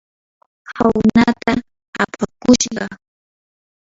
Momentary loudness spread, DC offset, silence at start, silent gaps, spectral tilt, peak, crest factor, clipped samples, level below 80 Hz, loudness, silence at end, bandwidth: 15 LU; under 0.1%; 0.7 s; 1.88-1.93 s; -4.5 dB/octave; 0 dBFS; 18 dB; under 0.1%; -44 dBFS; -16 LUFS; 1.05 s; 7.8 kHz